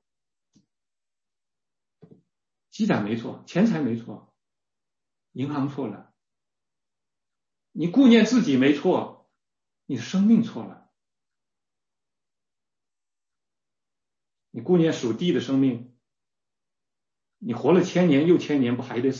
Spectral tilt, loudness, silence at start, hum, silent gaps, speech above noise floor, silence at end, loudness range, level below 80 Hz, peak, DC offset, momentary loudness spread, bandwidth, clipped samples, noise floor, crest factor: -6.5 dB/octave; -22 LUFS; 2.75 s; none; none; over 68 dB; 0 s; 11 LU; -72 dBFS; -6 dBFS; under 0.1%; 18 LU; 7.4 kHz; under 0.1%; under -90 dBFS; 20 dB